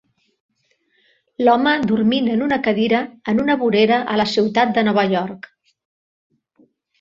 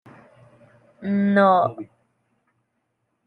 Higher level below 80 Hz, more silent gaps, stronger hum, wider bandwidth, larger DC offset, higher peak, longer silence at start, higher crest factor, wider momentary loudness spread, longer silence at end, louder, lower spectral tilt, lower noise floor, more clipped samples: first, -58 dBFS vs -74 dBFS; neither; neither; first, 7.4 kHz vs 4.8 kHz; neither; about the same, -2 dBFS vs -4 dBFS; first, 1.4 s vs 1 s; about the same, 18 dB vs 20 dB; second, 5 LU vs 23 LU; first, 1.65 s vs 1.45 s; about the same, -17 LUFS vs -19 LUFS; second, -6 dB/octave vs -9 dB/octave; second, -65 dBFS vs -74 dBFS; neither